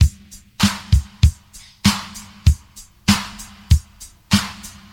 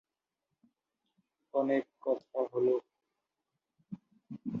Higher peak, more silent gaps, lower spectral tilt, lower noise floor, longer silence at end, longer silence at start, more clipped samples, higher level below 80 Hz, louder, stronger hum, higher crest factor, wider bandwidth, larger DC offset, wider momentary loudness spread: first, 0 dBFS vs -18 dBFS; neither; second, -4.5 dB/octave vs -9 dB/octave; second, -44 dBFS vs -87 dBFS; first, 0.25 s vs 0 s; second, 0 s vs 1.55 s; neither; first, -24 dBFS vs -82 dBFS; first, -20 LUFS vs -34 LUFS; neither; about the same, 18 dB vs 20 dB; first, 16.5 kHz vs 5.6 kHz; neither; about the same, 17 LU vs 19 LU